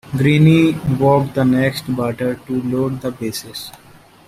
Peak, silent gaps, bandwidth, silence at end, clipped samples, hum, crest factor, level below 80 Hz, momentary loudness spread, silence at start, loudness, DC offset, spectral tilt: -2 dBFS; none; 15.5 kHz; 0.6 s; under 0.1%; none; 14 dB; -46 dBFS; 14 LU; 0.05 s; -17 LUFS; under 0.1%; -7 dB/octave